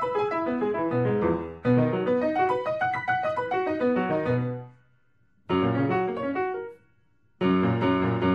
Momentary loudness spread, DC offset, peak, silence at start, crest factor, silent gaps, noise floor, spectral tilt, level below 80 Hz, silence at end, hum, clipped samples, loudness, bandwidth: 6 LU; under 0.1%; -10 dBFS; 0 s; 16 dB; none; -67 dBFS; -9 dB/octave; -58 dBFS; 0 s; none; under 0.1%; -26 LUFS; 7.4 kHz